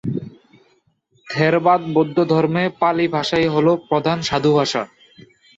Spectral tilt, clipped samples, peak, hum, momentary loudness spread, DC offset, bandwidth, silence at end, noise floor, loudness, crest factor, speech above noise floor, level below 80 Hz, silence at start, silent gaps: -6 dB/octave; under 0.1%; -4 dBFS; none; 9 LU; under 0.1%; 8 kHz; 0.7 s; -61 dBFS; -18 LUFS; 16 dB; 44 dB; -54 dBFS; 0.05 s; none